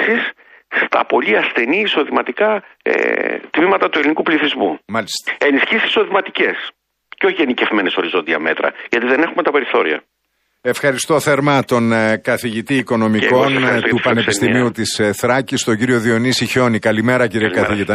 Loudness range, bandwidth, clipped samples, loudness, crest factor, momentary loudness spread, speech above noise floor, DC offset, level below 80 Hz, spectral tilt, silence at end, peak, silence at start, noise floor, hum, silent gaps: 2 LU; 15.5 kHz; under 0.1%; -15 LUFS; 14 dB; 5 LU; 40 dB; under 0.1%; -56 dBFS; -4.5 dB/octave; 0 s; -2 dBFS; 0 s; -55 dBFS; none; none